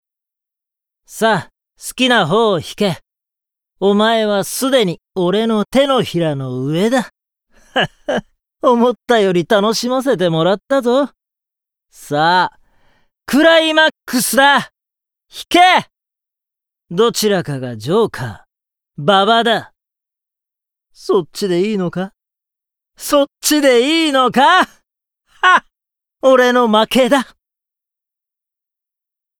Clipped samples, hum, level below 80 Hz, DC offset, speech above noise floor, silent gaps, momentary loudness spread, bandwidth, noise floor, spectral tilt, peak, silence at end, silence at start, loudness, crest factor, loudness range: under 0.1%; none; -54 dBFS; under 0.1%; 72 dB; none; 11 LU; over 20 kHz; -86 dBFS; -4 dB/octave; 0 dBFS; 2.15 s; 1.1 s; -14 LUFS; 16 dB; 5 LU